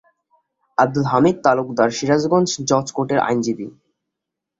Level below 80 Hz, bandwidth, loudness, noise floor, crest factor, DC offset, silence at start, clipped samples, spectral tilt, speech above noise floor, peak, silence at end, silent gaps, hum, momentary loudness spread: -58 dBFS; 7.8 kHz; -18 LUFS; -82 dBFS; 18 dB; under 0.1%; 0.8 s; under 0.1%; -5 dB/octave; 65 dB; -2 dBFS; 0.9 s; none; none; 8 LU